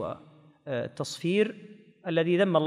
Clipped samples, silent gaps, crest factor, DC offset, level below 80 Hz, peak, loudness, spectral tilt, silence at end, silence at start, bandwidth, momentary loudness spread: under 0.1%; none; 18 dB; under 0.1%; -72 dBFS; -10 dBFS; -29 LUFS; -6 dB/octave; 0 s; 0 s; 13 kHz; 20 LU